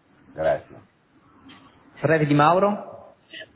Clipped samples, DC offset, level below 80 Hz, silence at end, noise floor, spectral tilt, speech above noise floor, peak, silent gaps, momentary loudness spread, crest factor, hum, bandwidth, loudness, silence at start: under 0.1%; under 0.1%; -58 dBFS; 0.1 s; -57 dBFS; -11 dB/octave; 37 dB; -4 dBFS; none; 24 LU; 22 dB; none; 4 kHz; -21 LUFS; 0.35 s